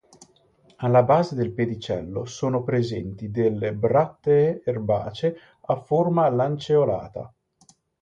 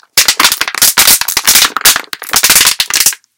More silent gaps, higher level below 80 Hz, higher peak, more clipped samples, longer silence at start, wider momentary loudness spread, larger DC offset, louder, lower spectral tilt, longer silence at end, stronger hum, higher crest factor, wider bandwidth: neither; second, -56 dBFS vs -42 dBFS; second, -6 dBFS vs 0 dBFS; second, under 0.1% vs 3%; first, 0.8 s vs 0.15 s; first, 10 LU vs 4 LU; neither; second, -23 LUFS vs -6 LUFS; first, -7.5 dB/octave vs 2 dB/octave; first, 0.75 s vs 0.2 s; neither; first, 16 dB vs 10 dB; second, 7.8 kHz vs over 20 kHz